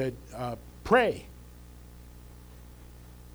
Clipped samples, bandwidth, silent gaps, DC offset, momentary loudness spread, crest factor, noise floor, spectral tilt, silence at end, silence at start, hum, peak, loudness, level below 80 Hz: under 0.1%; over 20 kHz; none; under 0.1%; 27 LU; 24 dB; -49 dBFS; -6 dB/octave; 0.05 s; 0 s; 60 Hz at -50 dBFS; -8 dBFS; -29 LUFS; -50 dBFS